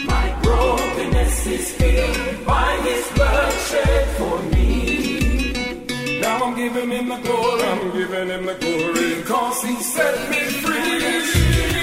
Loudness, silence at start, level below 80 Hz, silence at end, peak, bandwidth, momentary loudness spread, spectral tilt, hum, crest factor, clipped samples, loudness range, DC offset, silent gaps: -20 LUFS; 0 s; -24 dBFS; 0 s; -4 dBFS; 16 kHz; 5 LU; -4.5 dB/octave; none; 16 dB; under 0.1%; 2 LU; under 0.1%; none